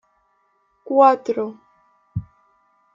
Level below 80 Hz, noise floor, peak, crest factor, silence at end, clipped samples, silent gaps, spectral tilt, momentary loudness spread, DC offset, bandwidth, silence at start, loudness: -56 dBFS; -65 dBFS; -4 dBFS; 20 dB; 0.7 s; under 0.1%; none; -8 dB/octave; 18 LU; under 0.1%; 7.4 kHz; 0.9 s; -18 LUFS